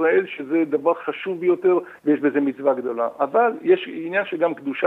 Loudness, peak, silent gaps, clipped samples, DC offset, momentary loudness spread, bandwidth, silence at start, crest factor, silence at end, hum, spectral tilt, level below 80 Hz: -21 LUFS; -6 dBFS; none; under 0.1%; under 0.1%; 5 LU; 4 kHz; 0 s; 16 dB; 0 s; none; -7.5 dB/octave; -76 dBFS